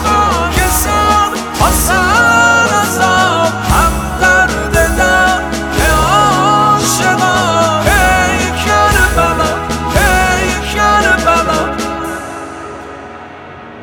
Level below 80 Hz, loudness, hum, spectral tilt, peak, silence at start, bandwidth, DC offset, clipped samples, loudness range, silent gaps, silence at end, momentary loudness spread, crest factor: -22 dBFS; -10 LUFS; none; -3.5 dB/octave; 0 dBFS; 0 s; over 20 kHz; under 0.1%; under 0.1%; 3 LU; none; 0 s; 13 LU; 12 dB